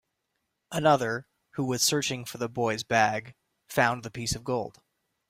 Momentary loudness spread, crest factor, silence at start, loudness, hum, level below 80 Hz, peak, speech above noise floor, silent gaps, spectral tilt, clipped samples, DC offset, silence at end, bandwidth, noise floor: 12 LU; 22 dB; 0.7 s; -28 LUFS; none; -58 dBFS; -8 dBFS; 53 dB; none; -3.5 dB/octave; under 0.1%; under 0.1%; 0.6 s; 16 kHz; -80 dBFS